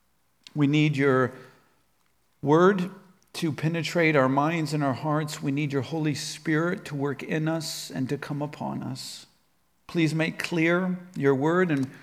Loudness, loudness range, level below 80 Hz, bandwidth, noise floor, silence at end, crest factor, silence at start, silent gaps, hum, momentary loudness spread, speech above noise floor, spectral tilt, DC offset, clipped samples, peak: -26 LUFS; 6 LU; -72 dBFS; 15.5 kHz; -70 dBFS; 0 s; 18 dB; 0.55 s; none; none; 11 LU; 45 dB; -6 dB/octave; under 0.1%; under 0.1%; -8 dBFS